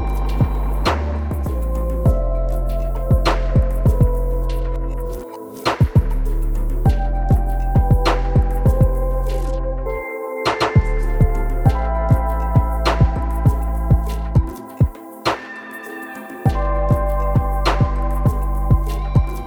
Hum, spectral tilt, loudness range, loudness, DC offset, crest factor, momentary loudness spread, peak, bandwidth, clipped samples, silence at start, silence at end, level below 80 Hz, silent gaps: none; -7.5 dB/octave; 3 LU; -20 LUFS; 0.2%; 16 dB; 8 LU; -2 dBFS; 17 kHz; under 0.1%; 0 s; 0 s; -20 dBFS; none